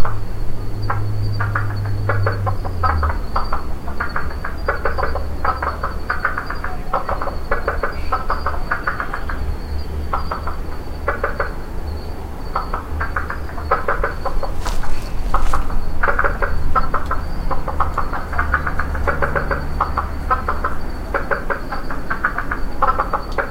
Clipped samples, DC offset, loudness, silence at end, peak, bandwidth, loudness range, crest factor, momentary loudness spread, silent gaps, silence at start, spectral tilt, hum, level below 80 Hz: under 0.1%; under 0.1%; -23 LUFS; 0 s; 0 dBFS; 9.2 kHz; 3 LU; 18 dB; 8 LU; none; 0 s; -6.5 dB/octave; none; -24 dBFS